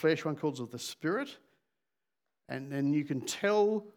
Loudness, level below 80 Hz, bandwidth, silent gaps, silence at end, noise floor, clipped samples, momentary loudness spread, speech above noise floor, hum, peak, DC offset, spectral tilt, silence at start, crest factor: -33 LUFS; -88 dBFS; 19 kHz; none; 0.05 s; -90 dBFS; under 0.1%; 13 LU; 58 dB; none; -16 dBFS; under 0.1%; -5 dB/octave; 0 s; 18 dB